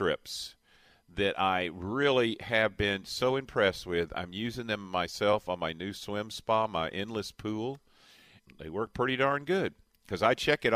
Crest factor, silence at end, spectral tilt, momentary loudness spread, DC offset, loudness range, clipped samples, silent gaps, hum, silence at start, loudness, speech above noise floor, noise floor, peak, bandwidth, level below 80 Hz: 20 dB; 0 s; -4.5 dB/octave; 11 LU; under 0.1%; 5 LU; under 0.1%; none; none; 0 s; -31 LUFS; 33 dB; -63 dBFS; -10 dBFS; 15.5 kHz; -58 dBFS